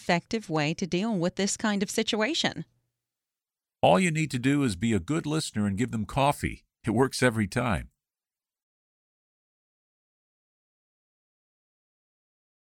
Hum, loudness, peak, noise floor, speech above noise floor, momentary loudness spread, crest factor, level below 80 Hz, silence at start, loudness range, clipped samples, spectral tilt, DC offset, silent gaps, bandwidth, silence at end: none; -27 LUFS; -8 dBFS; under -90 dBFS; over 63 dB; 7 LU; 20 dB; -52 dBFS; 0 s; 4 LU; under 0.1%; -5 dB/octave; under 0.1%; none; 16 kHz; 4.85 s